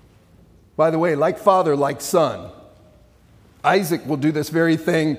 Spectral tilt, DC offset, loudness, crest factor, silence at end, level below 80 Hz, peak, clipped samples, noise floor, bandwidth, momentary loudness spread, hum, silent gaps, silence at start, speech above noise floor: -5.5 dB/octave; under 0.1%; -19 LUFS; 20 dB; 0 s; -58 dBFS; -2 dBFS; under 0.1%; -51 dBFS; 16.5 kHz; 6 LU; none; none; 0.8 s; 33 dB